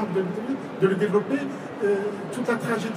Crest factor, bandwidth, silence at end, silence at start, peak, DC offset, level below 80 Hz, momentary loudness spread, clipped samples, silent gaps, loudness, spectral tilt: 18 dB; 15.5 kHz; 0 s; 0 s; -8 dBFS; under 0.1%; -74 dBFS; 7 LU; under 0.1%; none; -26 LUFS; -6.5 dB/octave